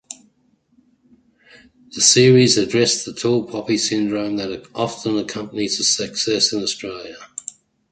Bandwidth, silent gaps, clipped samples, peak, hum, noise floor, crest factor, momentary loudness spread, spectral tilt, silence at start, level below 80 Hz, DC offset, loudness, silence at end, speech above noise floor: 9.4 kHz; none; under 0.1%; 0 dBFS; none; -61 dBFS; 20 dB; 21 LU; -3.5 dB/octave; 0.1 s; -58 dBFS; under 0.1%; -18 LUFS; 0.65 s; 43 dB